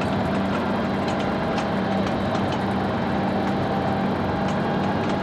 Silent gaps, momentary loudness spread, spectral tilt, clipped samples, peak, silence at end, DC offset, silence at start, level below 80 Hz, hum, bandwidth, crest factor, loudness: none; 1 LU; -7 dB/octave; under 0.1%; -12 dBFS; 0 s; under 0.1%; 0 s; -44 dBFS; none; 11.5 kHz; 12 dB; -24 LUFS